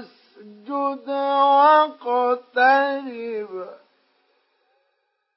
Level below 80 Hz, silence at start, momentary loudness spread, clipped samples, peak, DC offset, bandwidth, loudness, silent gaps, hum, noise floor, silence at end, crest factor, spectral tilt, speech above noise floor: under -90 dBFS; 0 s; 16 LU; under 0.1%; -6 dBFS; under 0.1%; 5.8 kHz; -20 LUFS; none; none; -72 dBFS; 1.6 s; 16 dB; -7 dB/octave; 53 dB